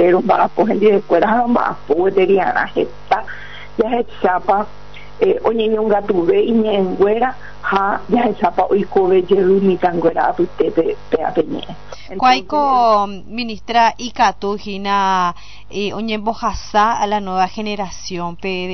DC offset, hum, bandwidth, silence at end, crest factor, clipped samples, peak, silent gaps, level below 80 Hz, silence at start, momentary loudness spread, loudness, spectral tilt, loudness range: 3%; none; 6.4 kHz; 0 s; 14 dB; under 0.1%; -2 dBFS; none; -42 dBFS; 0 s; 10 LU; -16 LUFS; -4 dB/octave; 3 LU